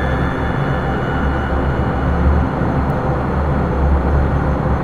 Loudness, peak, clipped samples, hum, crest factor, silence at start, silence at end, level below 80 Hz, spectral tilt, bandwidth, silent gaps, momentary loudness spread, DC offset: -18 LUFS; -2 dBFS; under 0.1%; none; 14 dB; 0 s; 0 s; -20 dBFS; -9 dB/octave; 6.6 kHz; none; 3 LU; 0.2%